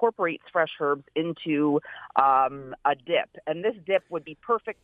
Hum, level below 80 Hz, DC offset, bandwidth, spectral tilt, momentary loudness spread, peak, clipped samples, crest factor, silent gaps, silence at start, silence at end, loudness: none; -70 dBFS; under 0.1%; 4.5 kHz; -8 dB/octave; 8 LU; -4 dBFS; under 0.1%; 22 dB; none; 0 s; 0.1 s; -26 LUFS